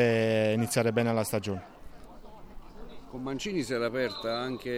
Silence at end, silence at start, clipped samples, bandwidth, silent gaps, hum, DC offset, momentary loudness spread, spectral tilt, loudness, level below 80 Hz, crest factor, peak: 0 s; 0 s; under 0.1%; 17.5 kHz; none; none; under 0.1%; 21 LU; -5 dB/octave; -29 LUFS; -54 dBFS; 18 dB; -12 dBFS